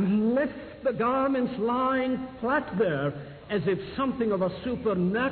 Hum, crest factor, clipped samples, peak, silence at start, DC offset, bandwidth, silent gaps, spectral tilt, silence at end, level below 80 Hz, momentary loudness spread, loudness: none; 12 dB; under 0.1%; -14 dBFS; 0 s; under 0.1%; 4.5 kHz; none; -11 dB/octave; 0 s; -56 dBFS; 6 LU; -27 LUFS